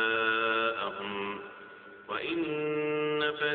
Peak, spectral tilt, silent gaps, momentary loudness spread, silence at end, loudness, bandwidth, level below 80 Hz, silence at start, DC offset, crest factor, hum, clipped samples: -16 dBFS; -1.5 dB/octave; none; 19 LU; 0 s; -31 LUFS; 4.6 kHz; -74 dBFS; 0 s; under 0.1%; 16 dB; none; under 0.1%